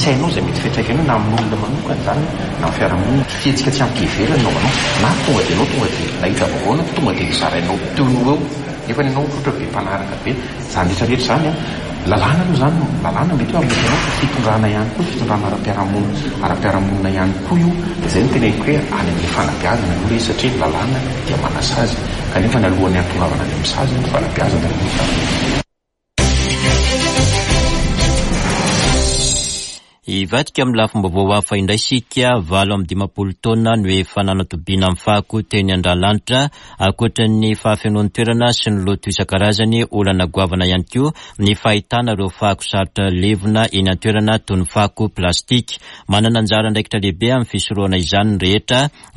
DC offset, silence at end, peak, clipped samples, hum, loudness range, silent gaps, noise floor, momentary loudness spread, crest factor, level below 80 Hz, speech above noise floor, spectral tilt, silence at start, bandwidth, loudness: under 0.1%; 0.25 s; -2 dBFS; under 0.1%; none; 2 LU; none; -73 dBFS; 5 LU; 14 dB; -28 dBFS; 57 dB; -5 dB/octave; 0 s; 11.5 kHz; -16 LUFS